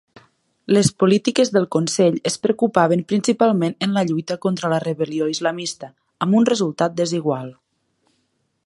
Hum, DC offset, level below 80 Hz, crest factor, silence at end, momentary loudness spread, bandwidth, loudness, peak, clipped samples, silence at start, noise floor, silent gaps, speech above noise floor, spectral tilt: none; under 0.1%; -62 dBFS; 18 dB; 1.15 s; 9 LU; 11.5 kHz; -19 LUFS; 0 dBFS; under 0.1%; 0.7 s; -69 dBFS; none; 50 dB; -5.5 dB/octave